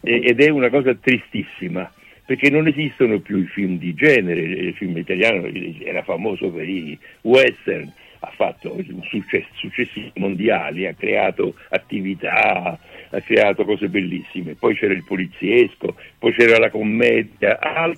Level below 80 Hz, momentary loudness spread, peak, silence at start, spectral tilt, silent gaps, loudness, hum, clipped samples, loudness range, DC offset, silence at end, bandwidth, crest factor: -58 dBFS; 14 LU; -2 dBFS; 0.05 s; -6.5 dB/octave; none; -19 LUFS; none; under 0.1%; 5 LU; under 0.1%; 0 s; 11.5 kHz; 18 dB